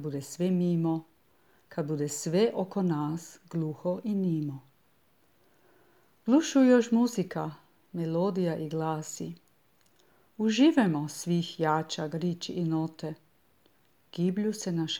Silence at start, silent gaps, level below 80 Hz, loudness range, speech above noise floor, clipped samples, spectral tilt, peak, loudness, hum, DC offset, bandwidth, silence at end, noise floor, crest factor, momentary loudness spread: 0 s; none; -76 dBFS; 6 LU; 40 dB; under 0.1%; -6 dB/octave; -12 dBFS; -29 LUFS; none; under 0.1%; 16.5 kHz; 0 s; -68 dBFS; 18 dB; 16 LU